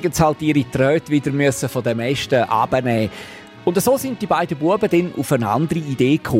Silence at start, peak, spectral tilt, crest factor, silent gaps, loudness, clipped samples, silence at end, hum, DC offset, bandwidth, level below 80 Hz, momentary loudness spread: 0 s; -2 dBFS; -6 dB/octave; 16 dB; none; -19 LUFS; under 0.1%; 0 s; none; under 0.1%; 16 kHz; -46 dBFS; 5 LU